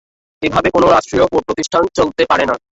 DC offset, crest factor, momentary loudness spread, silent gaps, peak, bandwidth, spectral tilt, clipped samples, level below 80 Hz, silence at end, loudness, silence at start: under 0.1%; 14 dB; 6 LU; none; 0 dBFS; 8.2 kHz; -4.5 dB/octave; under 0.1%; -40 dBFS; 0.2 s; -14 LUFS; 0.4 s